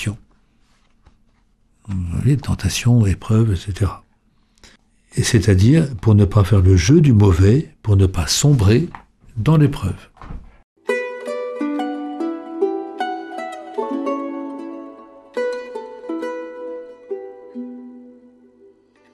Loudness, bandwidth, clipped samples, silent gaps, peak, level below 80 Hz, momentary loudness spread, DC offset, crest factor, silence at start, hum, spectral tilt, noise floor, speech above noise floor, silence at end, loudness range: -18 LUFS; 13.5 kHz; under 0.1%; 10.64-10.76 s; -2 dBFS; -36 dBFS; 20 LU; under 0.1%; 16 dB; 0 s; 50 Hz at -40 dBFS; -6.5 dB/octave; -59 dBFS; 44 dB; 1.05 s; 15 LU